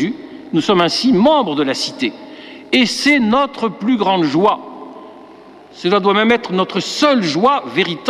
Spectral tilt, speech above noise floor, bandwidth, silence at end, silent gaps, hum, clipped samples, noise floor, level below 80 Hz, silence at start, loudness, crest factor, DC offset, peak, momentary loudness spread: -4.5 dB/octave; 25 dB; 13.5 kHz; 0 s; none; none; under 0.1%; -40 dBFS; -54 dBFS; 0 s; -15 LUFS; 14 dB; under 0.1%; -2 dBFS; 12 LU